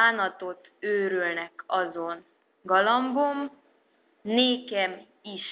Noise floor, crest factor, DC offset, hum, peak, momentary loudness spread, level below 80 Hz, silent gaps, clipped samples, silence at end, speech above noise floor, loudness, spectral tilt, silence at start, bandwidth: -66 dBFS; 20 dB; under 0.1%; none; -8 dBFS; 17 LU; -80 dBFS; none; under 0.1%; 0 s; 39 dB; -26 LUFS; -0.5 dB/octave; 0 s; 4 kHz